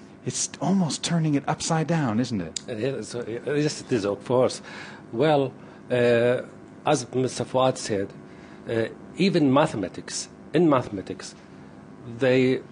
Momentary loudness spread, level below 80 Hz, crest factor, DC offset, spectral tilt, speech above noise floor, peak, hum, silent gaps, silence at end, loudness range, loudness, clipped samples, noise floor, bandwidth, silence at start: 15 LU; -60 dBFS; 20 dB; under 0.1%; -5 dB/octave; 21 dB; -4 dBFS; none; none; 0 s; 2 LU; -25 LUFS; under 0.1%; -45 dBFS; 10.5 kHz; 0 s